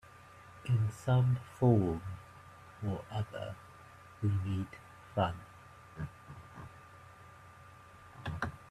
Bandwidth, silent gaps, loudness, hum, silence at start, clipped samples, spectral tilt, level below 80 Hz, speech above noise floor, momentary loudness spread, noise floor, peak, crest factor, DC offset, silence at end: 12 kHz; none; -35 LUFS; none; 0.15 s; under 0.1%; -8 dB/octave; -62 dBFS; 23 dB; 25 LU; -56 dBFS; -14 dBFS; 22 dB; under 0.1%; 0.05 s